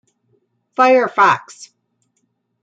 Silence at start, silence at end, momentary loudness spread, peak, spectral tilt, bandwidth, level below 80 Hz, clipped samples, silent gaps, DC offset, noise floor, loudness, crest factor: 0.8 s; 1.2 s; 10 LU; -2 dBFS; -4 dB/octave; 9 kHz; -74 dBFS; under 0.1%; none; under 0.1%; -68 dBFS; -14 LUFS; 16 dB